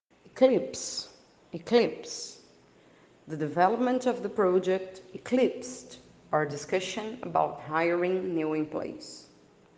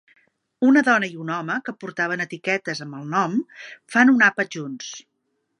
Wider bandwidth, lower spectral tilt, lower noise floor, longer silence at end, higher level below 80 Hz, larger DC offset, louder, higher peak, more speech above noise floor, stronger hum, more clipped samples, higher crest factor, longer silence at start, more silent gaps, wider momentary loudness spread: about the same, 9.8 kHz vs 10.5 kHz; about the same, -5 dB/octave vs -5 dB/octave; second, -59 dBFS vs -74 dBFS; about the same, 0.55 s vs 0.6 s; first, -72 dBFS vs -78 dBFS; neither; second, -29 LUFS vs -21 LUFS; second, -8 dBFS vs -2 dBFS; second, 30 dB vs 52 dB; neither; neither; about the same, 22 dB vs 20 dB; second, 0.35 s vs 0.6 s; neither; about the same, 17 LU vs 17 LU